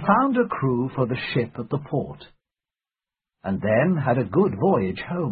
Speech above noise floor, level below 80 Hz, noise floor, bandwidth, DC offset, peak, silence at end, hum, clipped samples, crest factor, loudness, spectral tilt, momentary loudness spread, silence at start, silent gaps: over 68 dB; -54 dBFS; under -90 dBFS; 4.9 kHz; under 0.1%; -4 dBFS; 0 s; none; under 0.1%; 20 dB; -23 LUFS; -12 dB/octave; 9 LU; 0 s; none